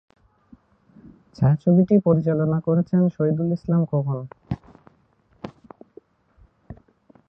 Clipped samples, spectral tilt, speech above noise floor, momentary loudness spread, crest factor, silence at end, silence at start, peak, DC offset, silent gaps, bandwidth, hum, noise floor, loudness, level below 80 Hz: under 0.1%; -12 dB/octave; 41 dB; 18 LU; 18 dB; 0.55 s; 1.4 s; -6 dBFS; under 0.1%; none; 5.6 kHz; none; -61 dBFS; -21 LUFS; -52 dBFS